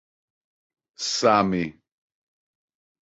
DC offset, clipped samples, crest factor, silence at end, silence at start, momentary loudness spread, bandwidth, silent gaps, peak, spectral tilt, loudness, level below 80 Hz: under 0.1%; under 0.1%; 22 dB; 1.35 s; 1 s; 12 LU; 8.2 kHz; none; -6 dBFS; -4 dB/octave; -23 LUFS; -60 dBFS